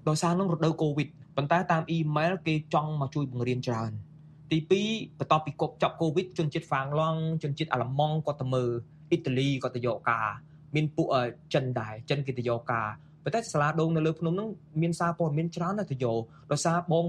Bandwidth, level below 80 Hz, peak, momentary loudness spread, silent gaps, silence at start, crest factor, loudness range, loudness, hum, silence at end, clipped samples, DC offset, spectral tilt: 11 kHz; -64 dBFS; -10 dBFS; 7 LU; none; 0.05 s; 20 dB; 1 LU; -29 LUFS; none; 0 s; under 0.1%; under 0.1%; -6.5 dB/octave